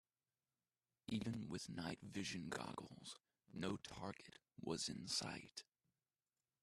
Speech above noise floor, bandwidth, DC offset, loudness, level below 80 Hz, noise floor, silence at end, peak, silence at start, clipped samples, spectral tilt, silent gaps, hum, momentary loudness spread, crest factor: over 41 dB; 13.5 kHz; under 0.1%; -48 LUFS; -76 dBFS; under -90 dBFS; 1 s; -30 dBFS; 1.1 s; under 0.1%; -4 dB/octave; none; none; 14 LU; 20 dB